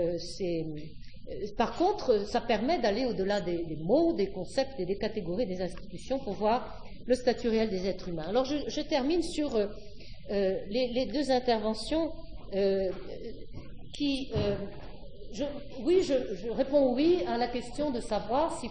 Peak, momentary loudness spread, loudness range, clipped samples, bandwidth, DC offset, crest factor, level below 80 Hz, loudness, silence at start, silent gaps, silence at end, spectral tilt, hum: -12 dBFS; 17 LU; 4 LU; under 0.1%; 10.5 kHz; 0.7%; 18 dB; -48 dBFS; -30 LUFS; 0 s; none; 0 s; -5.5 dB/octave; none